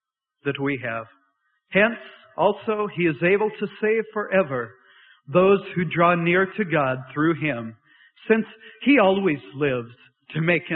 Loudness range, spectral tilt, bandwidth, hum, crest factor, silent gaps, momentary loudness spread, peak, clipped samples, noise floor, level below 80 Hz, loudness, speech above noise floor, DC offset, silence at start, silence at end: 2 LU; -11 dB/octave; 4.3 kHz; none; 18 dB; none; 14 LU; -4 dBFS; under 0.1%; -69 dBFS; -62 dBFS; -22 LUFS; 47 dB; under 0.1%; 0.45 s; 0 s